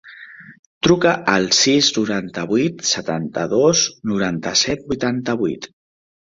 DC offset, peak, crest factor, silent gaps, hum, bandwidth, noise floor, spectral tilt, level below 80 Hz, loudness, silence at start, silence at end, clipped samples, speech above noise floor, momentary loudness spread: under 0.1%; -2 dBFS; 18 dB; 0.59-0.81 s; none; 7.8 kHz; -40 dBFS; -3 dB/octave; -52 dBFS; -18 LUFS; 0.05 s; 0.55 s; under 0.1%; 22 dB; 10 LU